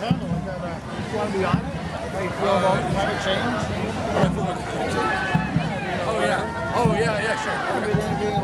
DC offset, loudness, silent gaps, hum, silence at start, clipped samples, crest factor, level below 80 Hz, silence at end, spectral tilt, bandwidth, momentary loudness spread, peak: under 0.1%; -24 LUFS; none; none; 0 s; under 0.1%; 18 dB; -42 dBFS; 0 s; -6 dB/octave; 12.5 kHz; 7 LU; -6 dBFS